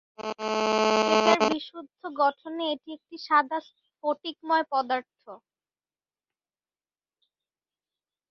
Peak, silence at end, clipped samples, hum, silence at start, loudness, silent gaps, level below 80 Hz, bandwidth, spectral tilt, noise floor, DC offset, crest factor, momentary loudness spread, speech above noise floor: -4 dBFS; 2.95 s; under 0.1%; none; 0.2 s; -26 LUFS; none; -74 dBFS; 7.4 kHz; -3 dB/octave; under -90 dBFS; under 0.1%; 24 dB; 16 LU; over 61 dB